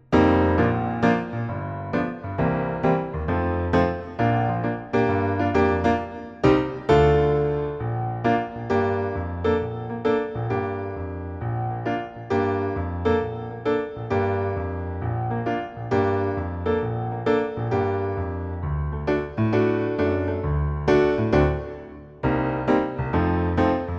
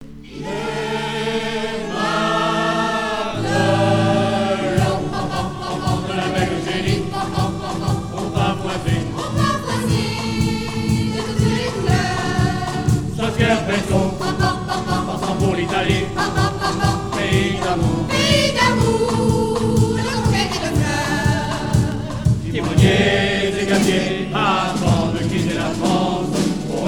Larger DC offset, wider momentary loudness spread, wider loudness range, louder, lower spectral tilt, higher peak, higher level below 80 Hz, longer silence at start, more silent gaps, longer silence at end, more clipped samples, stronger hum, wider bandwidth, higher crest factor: neither; first, 9 LU vs 6 LU; about the same, 5 LU vs 4 LU; second, -24 LUFS vs -19 LUFS; first, -8.5 dB/octave vs -5.5 dB/octave; second, -4 dBFS vs 0 dBFS; about the same, -38 dBFS vs -36 dBFS; about the same, 0.1 s vs 0 s; neither; about the same, 0 s vs 0 s; neither; neither; second, 7.6 kHz vs 18 kHz; about the same, 18 dB vs 18 dB